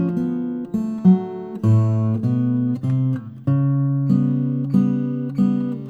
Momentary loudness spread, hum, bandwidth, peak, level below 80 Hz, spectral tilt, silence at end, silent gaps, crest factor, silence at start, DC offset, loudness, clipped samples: 7 LU; none; 4.8 kHz; -4 dBFS; -58 dBFS; -11 dB/octave; 0 s; none; 16 dB; 0 s; under 0.1%; -20 LUFS; under 0.1%